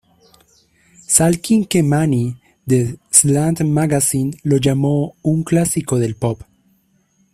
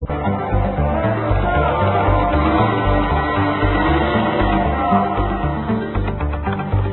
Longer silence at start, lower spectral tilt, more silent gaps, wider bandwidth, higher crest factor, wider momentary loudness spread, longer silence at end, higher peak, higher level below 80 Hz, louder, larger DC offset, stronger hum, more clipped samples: first, 1.1 s vs 0 s; second, -5 dB/octave vs -12.5 dB/octave; neither; first, 16 kHz vs 4.2 kHz; about the same, 18 dB vs 14 dB; first, 8 LU vs 5 LU; first, 0.9 s vs 0 s; about the same, 0 dBFS vs -2 dBFS; second, -48 dBFS vs -24 dBFS; about the same, -16 LUFS vs -18 LUFS; neither; neither; neither